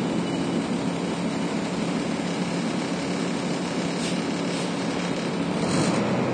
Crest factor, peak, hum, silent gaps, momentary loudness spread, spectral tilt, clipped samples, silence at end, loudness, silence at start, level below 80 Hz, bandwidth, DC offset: 14 dB; -12 dBFS; none; none; 4 LU; -5 dB/octave; under 0.1%; 0 s; -26 LUFS; 0 s; -56 dBFS; 10 kHz; under 0.1%